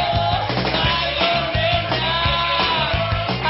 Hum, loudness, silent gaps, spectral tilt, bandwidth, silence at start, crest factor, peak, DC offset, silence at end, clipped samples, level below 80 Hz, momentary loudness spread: none; -18 LUFS; none; -8.5 dB/octave; 5.8 kHz; 0 s; 14 dB; -6 dBFS; under 0.1%; 0 s; under 0.1%; -34 dBFS; 3 LU